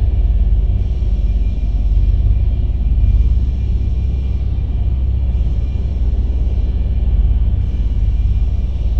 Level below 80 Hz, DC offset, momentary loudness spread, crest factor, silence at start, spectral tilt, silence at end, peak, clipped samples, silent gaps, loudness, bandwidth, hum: -14 dBFS; 4%; 3 LU; 10 dB; 0 s; -9.5 dB/octave; 0 s; -4 dBFS; under 0.1%; none; -18 LUFS; 4.1 kHz; none